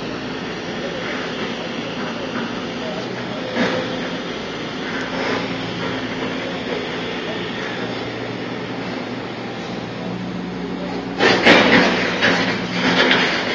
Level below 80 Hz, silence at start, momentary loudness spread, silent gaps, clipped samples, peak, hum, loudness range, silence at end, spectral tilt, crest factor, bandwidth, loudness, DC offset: -50 dBFS; 0 s; 13 LU; none; under 0.1%; 0 dBFS; none; 10 LU; 0 s; -4.5 dB/octave; 22 dB; 8 kHz; -20 LUFS; under 0.1%